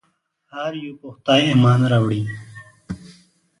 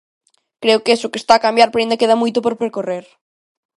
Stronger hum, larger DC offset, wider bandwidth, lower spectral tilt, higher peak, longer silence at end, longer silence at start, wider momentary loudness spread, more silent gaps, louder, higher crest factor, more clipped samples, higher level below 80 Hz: neither; neither; about the same, 11 kHz vs 11.5 kHz; first, -6.5 dB/octave vs -3.5 dB/octave; about the same, -2 dBFS vs 0 dBFS; second, 0.55 s vs 0.8 s; about the same, 0.55 s vs 0.6 s; first, 20 LU vs 10 LU; neither; second, -18 LUFS vs -15 LUFS; about the same, 18 dB vs 16 dB; neither; first, -52 dBFS vs -60 dBFS